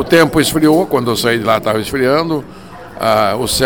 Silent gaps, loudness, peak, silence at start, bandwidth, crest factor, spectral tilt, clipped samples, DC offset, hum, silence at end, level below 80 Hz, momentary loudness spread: none; -13 LUFS; 0 dBFS; 0 s; 18.5 kHz; 14 dB; -4.5 dB/octave; under 0.1%; 0.6%; none; 0 s; -40 dBFS; 11 LU